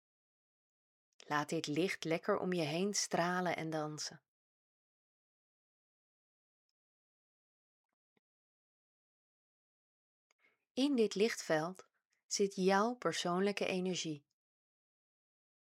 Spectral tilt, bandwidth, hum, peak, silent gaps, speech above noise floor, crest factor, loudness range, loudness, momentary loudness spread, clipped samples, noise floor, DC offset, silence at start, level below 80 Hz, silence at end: -4 dB/octave; 16 kHz; none; -18 dBFS; 4.28-10.39 s, 10.70-10.75 s, 12.05-12.10 s, 12.24-12.29 s; over 54 dB; 22 dB; 9 LU; -36 LUFS; 9 LU; under 0.1%; under -90 dBFS; under 0.1%; 1.3 s; under -90 dBFS; 1.45 s